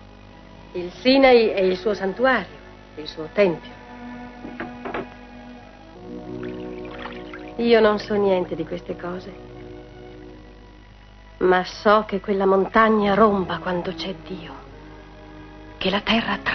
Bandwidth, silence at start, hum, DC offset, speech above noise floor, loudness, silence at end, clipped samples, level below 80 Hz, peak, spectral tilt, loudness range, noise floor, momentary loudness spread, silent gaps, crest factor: 6.4 kHz; 0 s; 50 Hz at -45 dBFS; under 0.1%; 25 dB; -20 LUFS; 0 s; under 0.1%; -48 dBFS; -2 dBFS; -6.5 dB/octave; 12 LU; -45 dBFS; 25 LU; none; 20 dB